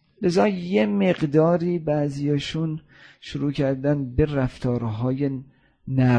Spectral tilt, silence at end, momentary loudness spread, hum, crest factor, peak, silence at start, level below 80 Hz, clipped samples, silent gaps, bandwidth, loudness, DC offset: -8 dB/octave; 0 s; 9 LU; none; 18 dB; -6 dBFS; 0.2 s; -44 dBFS; under 0.1%; none; 9.8 kHz; -23 LUFS; under 0.1%